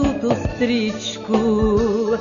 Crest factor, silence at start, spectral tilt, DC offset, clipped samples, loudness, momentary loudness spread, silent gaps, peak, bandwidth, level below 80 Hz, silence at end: 14 dB; 0 s; -6 dB/octave; under 0.1%; under 0.1%; -20 LUFS; 5 LU; none; -4 dBFS; 7.4 kHz; -34 dBFS; 0 s